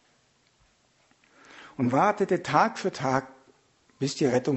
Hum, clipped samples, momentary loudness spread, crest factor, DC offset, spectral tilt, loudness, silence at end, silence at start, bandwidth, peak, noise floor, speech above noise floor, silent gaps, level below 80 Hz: none; under 0.1%; 9 LU; 20 dB; under 0.1%; -5.5 dB/octave; -26 LUFS; 0 s; 1.55 s; 8.2 kHz; -8 dBFS; -66 dBFS; 41 dB; none; -68 dBFS